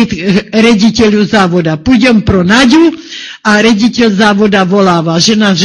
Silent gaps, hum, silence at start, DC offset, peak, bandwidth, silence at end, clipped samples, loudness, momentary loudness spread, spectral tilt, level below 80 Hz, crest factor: none; none; 0 s; under 0.1%; 0 dBFS; 11 kHz; 0 s; 0.6%; -7 LUFS; 5 LU; -5 dB/octave; -34 dBFS; 8 dB